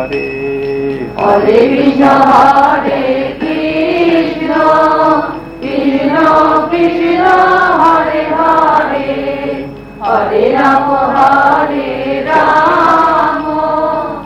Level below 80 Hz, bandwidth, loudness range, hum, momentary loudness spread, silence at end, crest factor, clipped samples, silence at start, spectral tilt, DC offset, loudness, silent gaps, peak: -40 dBFS; 13 kHz; 2 LU; none; 9 LU; 0 s; 10 dB; 0.8%; 0 s; -6.5 dB/octave; under 0.1%; -10 LUFS; none; 0 dBFS